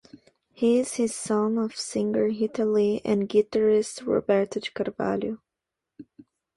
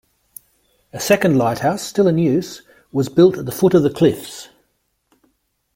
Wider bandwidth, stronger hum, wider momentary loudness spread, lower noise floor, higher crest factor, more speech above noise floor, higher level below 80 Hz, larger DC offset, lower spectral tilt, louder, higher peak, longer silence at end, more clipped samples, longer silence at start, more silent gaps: second, 11.5 kHz vs 16.5 kHz; neither; second, 7 LU vs 19 LU; first, -86 dBFS vs -68 dBFS; about the same, 16 dB vs 18 dB; first, 62 dB vs 52 dB; second, -64 dBFS vs -54 dBFS; neither; about the same, -5 dB/octave vs -6 dB/octave; second, -25 LUFS vs -17 LUFS; second, -10 dBFS vs -2 dBFS; second, 0.55 s vs 1.3 s; neither; second, 0.6 s vs 0.95 s; neither